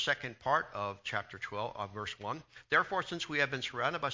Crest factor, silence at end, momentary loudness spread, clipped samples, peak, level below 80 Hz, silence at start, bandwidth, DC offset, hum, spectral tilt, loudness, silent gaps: 22 dB; 0 s; 10 LU; under 0.1%; -14 dBFS; -68 dBFS; 0 s; 7.6 kHz; under 0.1%; none; -4 dB/octave; -35 LUFS; none